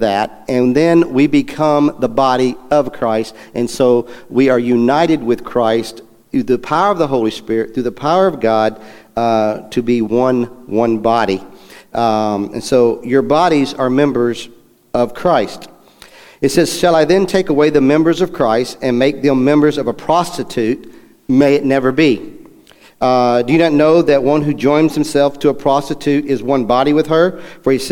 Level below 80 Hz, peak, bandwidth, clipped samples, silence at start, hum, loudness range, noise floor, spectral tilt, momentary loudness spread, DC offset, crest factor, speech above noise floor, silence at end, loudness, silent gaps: -44 dBFS; 0 dBFS; 16.5 kHz; under 0.1%; 0 s; none; 3 LU; -44 dBFS; -6 dB/octave; 8 LU; under 0.1%; 14 dB; 31 dB; 0 s; -14 LUFS; none